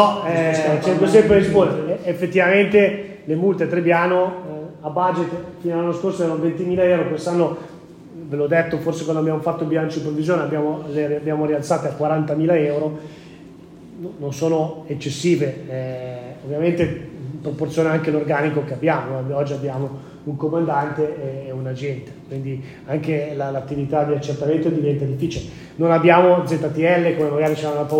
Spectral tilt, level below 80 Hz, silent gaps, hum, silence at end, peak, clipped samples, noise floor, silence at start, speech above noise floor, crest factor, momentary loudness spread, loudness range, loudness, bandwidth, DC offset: -7 dB/octave; -54 dBFS; none; none; 0 s; 0 dBFS; under 0.1%; -41 dBFS; 0 s; 22 dB; 20 dB; 14 LU; 7 LU; -20 LUFS; 16 kHz; under 0.1%